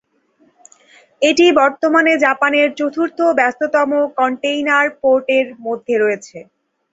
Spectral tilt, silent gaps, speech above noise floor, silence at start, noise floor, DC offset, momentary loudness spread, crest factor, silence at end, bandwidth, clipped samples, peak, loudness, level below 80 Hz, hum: -3 dB/octave; none; 42 dB; 1.2 s; -57 dBFS; under 0.1%; 7 LU; 16 dB; 0.5 s; 8 kHz; under 0.1%; 0 dBFS; -15 LUFS; -62 dBFS; none